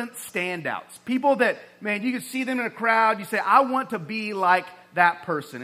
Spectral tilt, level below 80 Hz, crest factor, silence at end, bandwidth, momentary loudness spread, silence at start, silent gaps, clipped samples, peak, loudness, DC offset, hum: -4.5 dB/octave; -78 dBFS; 20 dB; 0 s; 16 kHz; 11 LU; 0 s; none; under 0.1%; -4 dBFS; -23 LUFS; under 0.1%; none